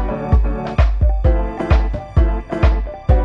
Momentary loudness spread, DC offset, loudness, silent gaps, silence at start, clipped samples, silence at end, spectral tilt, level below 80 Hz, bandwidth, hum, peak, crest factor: 3 LU; under 0.1%; -18 LUFS; none; 0 s; under 0.1%; 0 s; -9 dB/octave; -16 dBFS; 5.6 kHz; none; -2 dBFS; 14 dB